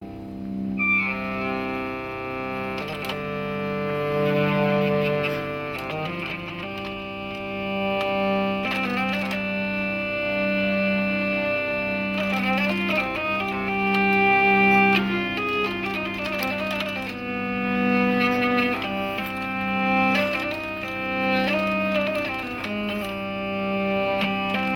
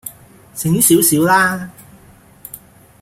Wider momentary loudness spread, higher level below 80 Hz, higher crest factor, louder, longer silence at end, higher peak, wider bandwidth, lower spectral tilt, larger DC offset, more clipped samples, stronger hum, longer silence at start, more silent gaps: second, 9 LU vs 24 LU; about the same, -52 dBFS vs -52 dBFS; about the same, 18 dB vs 18 dB; second, -24 LUFS vs -13 LUFS; second, 0 s vs 0.45 s; second, -8 dBFS vs 0 dBFS; about the same, 17 kHz vs 16.5 kHz; first, -6.5 dB/octave vs -4 dB/octave; neither; neither; neither; about the same, 0 s vs 0.05 s; neither